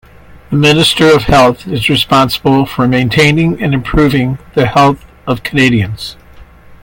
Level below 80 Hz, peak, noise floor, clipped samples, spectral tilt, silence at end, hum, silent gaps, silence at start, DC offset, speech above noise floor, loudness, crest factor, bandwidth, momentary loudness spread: -30 dBFS; 0 dBFS; -36 dBFS; under 0.1%; -5.5 dB/octave; 0.05 s; none; none; 0.5 s; under 0.1%; 26 dB; -10 LUFS; 10 dB; 17 kHz; 10 LU